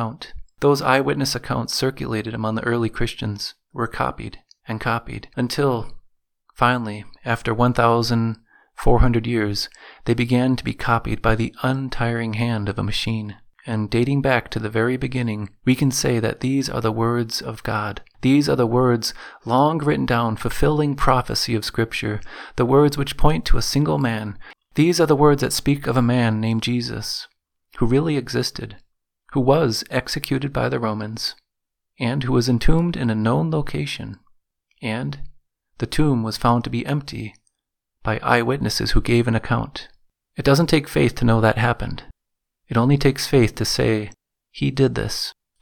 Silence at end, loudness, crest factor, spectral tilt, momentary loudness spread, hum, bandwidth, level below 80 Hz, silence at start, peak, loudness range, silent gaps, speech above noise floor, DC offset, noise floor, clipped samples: 0.3 s; -21 LUFS; 20 dB; -5.5 dB/octave; 12 LU; none; 18.5 kHz; -32 dBFS; 0 s; 0 dBFS; 5 LU; none; 60 dB; under 0.1%; -80 dBFS; under 0.1%